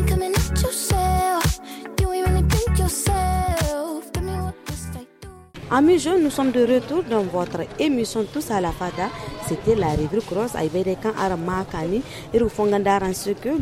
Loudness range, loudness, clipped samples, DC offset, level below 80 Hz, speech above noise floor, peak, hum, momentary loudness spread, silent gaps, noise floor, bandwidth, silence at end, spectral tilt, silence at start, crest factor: 3 LU; -22 LUFS; under 0.1%; under 0.1%; -30 dBFS; 21 dB; -6 dBFS; none; 9 LU; none; -43 dBFS; 16.5 kHz; 0 s; -5.5 dB/octave; 0 s; 16 dB